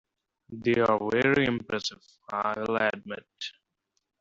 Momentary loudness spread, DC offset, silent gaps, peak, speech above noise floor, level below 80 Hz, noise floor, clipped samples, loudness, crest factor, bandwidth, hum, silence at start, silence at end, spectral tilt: 15 LU; under 0.1%; none; -10 dBFS; 52 dB; -62 dBFS; -80 dBFS; under 0.1%; -27 LUFS; 20 dB; 7.8 kHz; none; 0.5 s; 0.7 s; -5.5 dB/octave